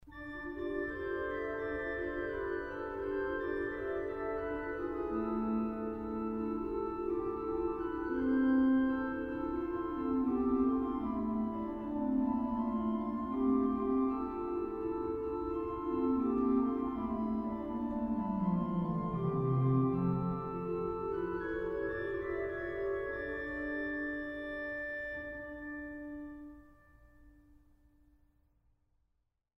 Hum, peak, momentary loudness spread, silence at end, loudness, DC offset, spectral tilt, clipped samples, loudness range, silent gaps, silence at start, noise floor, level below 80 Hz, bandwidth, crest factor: none; -20 dBFS; 8 LU; 2.25 s; -35 LUFS; under 0.1%; -10 dB/octave; under 0.1%; 7 LU; none; 0.05 s; -80 dBFS; -54 dBFS; 5.4 kHz; 16 dB